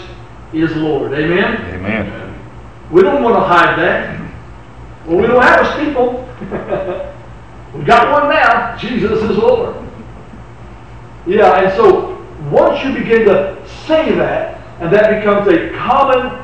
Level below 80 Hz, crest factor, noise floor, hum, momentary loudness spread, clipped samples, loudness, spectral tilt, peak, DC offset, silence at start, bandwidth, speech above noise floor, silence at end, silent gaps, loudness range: -36 dBFS; 14 dB; -33 dBFS; none; 17 LU; under 0.1%; -12 LUFS; -7 dB/octave; 0 dBFS; 1%; 0 s; 8.8 kHz; 22 dB; 0 s; none; 3 LU